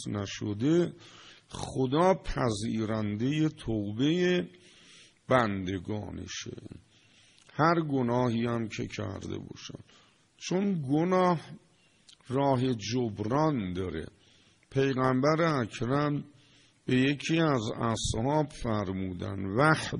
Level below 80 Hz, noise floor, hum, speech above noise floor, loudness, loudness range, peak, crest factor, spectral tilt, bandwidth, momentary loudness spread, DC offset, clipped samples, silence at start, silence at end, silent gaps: -52 dBFS; -62 dBFS; none; 33 dB; -29 LUFS; 3 LU; -10 dBFS; 20 dB; -6 dB/octave; 10.5 kHz; 15 LU; under 0.1%; under 0.1%; 0 s; 0 s; none